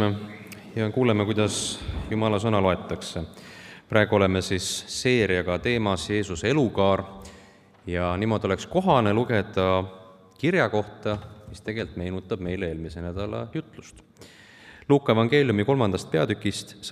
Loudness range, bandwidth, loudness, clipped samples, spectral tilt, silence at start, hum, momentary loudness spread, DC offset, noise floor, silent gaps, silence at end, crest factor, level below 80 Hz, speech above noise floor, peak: 6 LU; 14.5 kHz; -25 LUFS; under 0.1%; -5.5 dB/octave; 0 s; none; 15 LU; under 0.1%; -52 dBFS; none; 0 s; 22 dB; -50 dBFS; 28 dB; -4 dBFS